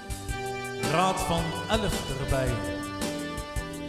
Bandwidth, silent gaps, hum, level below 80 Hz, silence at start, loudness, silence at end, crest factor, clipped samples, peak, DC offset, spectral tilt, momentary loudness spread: 16 kHz; none; none; -38 dBFS; 0 s; -29 LUFS; 0 s; 18 dB; under 0.1%; -12 dBFS; under 0.1%; -4.5 dB/octave; 9 LU